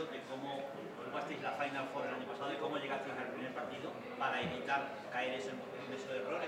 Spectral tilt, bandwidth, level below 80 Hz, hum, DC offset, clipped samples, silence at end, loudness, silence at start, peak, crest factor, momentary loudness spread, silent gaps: -4.5 dB/octave; 16 kHz; -84 dBFS; none; under 0.1%; under 0.1%; 0 s; -41 LUFS; 0 s; -22 dBFS; 20 dB; 7 LU; none